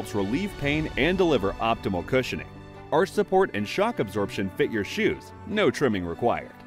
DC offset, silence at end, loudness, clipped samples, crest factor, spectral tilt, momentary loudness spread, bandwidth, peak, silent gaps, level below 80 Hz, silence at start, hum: under 0.1%; 0 s; -26 LUFS; under 0.1%; 16 dB; -6 dB/octave; 6 LU; 16 kHz; -10 dBFS; none; -46 dBFS; 0 s; none